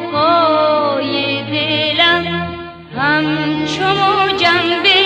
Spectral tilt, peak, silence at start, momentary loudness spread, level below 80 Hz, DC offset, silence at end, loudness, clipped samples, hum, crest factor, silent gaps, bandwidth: -5 dB/octave; 0 dBFS; 0 s; 8 LU; -50 dBFS; under 0.1%; 0 s; -14 LUFS; under 0.1%; none; 14 dB; none; 9.4 kHz